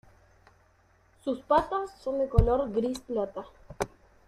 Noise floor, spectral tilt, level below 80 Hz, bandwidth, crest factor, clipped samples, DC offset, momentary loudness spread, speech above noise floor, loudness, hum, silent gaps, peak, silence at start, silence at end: -64 dBFS; -7.5 dB/octave; -38 dBFS; 14 kHz; 24 dB; under 0.1%; under 0.1%; 12 LU; 36 dB; -29 LUFS; none; none; -6 dBFS; 1.25 s; 0.4 s